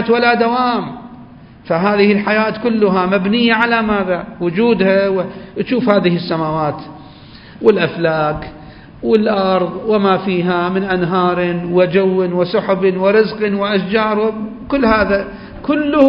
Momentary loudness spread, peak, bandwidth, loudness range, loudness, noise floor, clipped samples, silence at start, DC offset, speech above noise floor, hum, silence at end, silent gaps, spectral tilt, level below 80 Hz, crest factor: 8 LU; 0 dBFS; 5.4 kHz; 3 LU; -15 LUFS; -38 dBFS; under 0.1%; 0 s; under 0.1%; 24 dB; none; 0 s; none; -9 dB/octave; -44 dBFS; 14 dB